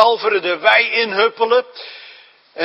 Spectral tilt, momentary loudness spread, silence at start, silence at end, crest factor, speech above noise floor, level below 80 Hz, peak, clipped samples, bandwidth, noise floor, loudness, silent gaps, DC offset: -3.5 dB/octave; 20 LU; 0 s; 0 s; 16 dB; 28 dB; -72 dBFS; 0 dBFS; under 0.1%; 7.2 kHz; -44 dBFS; -15 LUFS; none; under 0.1%